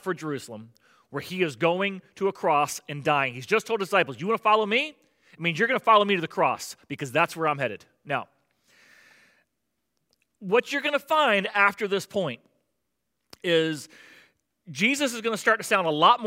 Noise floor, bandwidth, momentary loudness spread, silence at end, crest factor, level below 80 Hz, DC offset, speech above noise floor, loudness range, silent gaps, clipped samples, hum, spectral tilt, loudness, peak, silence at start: -80 dBFS; 16 kHz; 14 LU; 0 s; 22 dB; -78 dBFS; under 0.1%; 55 dB; 7 LU; none; under 0.1%; none; -4 dB/octave; -25 LUFS; -6 dBFS; 0.05 s